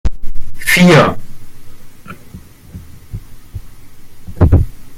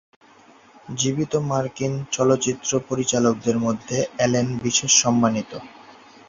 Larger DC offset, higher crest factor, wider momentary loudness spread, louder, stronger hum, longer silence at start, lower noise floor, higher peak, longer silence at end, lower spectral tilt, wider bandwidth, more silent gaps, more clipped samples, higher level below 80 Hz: neither; second, 14 dB vs 20 dB; first, 28 LU vs 10 LU; first, -11 LUFS vs -21 LUFS; neither; second, 0.05 s vs 0.85 s; second, -35 dBFS vs -51 dBFS; about the same, 0 dBFS vs -2 dBFS; second, 0 s vs 0.35 s; first, -5.5 dB/octave vs -4 dB/octave; first, 16 kHz vs 7.8 kHz; neither; neither; first, -24 dBFS vs -56 dBFS